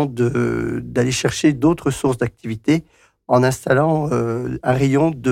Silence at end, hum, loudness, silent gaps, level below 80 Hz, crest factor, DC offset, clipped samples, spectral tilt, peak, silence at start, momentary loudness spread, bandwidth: 0 s; none; -19 LUFS; none; -44 dBFS; 14 dB; under 0.1%; under 0.1%; -6 dB/octave; -4 dBFS; 0 s; 6 LU; 16 kHz